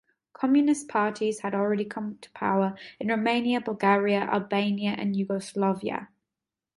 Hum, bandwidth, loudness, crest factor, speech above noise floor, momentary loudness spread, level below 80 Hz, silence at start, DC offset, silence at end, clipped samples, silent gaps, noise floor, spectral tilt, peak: none; 11.5 kHz; -27 LUFS; 18 dB; 63 dB; 9 LU; -70 dBFS; 0.4 s; under 0.1%; 0.7 s; under 0.1%; none; -89 dBFS; -6 dB/octave; -8 dBFS